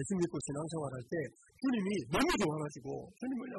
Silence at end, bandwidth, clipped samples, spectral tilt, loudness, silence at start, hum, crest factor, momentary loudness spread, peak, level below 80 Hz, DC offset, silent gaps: 0 s; 12 kHz; under 0.1%; -5 dB/octave; -36 LUFS; 0 s; none; 16 dB; 10 LU; -20 dBFS; -60 dBFS; under 0.1%; none